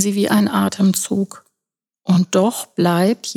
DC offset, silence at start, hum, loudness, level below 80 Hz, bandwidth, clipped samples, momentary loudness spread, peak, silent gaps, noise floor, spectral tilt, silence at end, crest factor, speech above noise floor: under 0.1%; 0 s; none; -17 LUFS; -66 dBFS; 18 kHz; under 0.1%; 6 LU; -2 dBFS; none; -85 dBFS; -5.5 dB/octave; 0 s; 16 dB; 69 dB